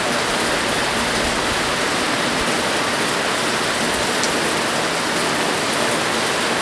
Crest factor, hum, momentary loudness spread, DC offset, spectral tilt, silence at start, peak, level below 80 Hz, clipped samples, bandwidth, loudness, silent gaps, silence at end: 18 dB; none; 1 LU; under 0.1%; -2 dB/octave; 0 s; -2 dBFS; -44 dBFS; under 0.1%; 11 kHz; -18 LUFS; none; 0 s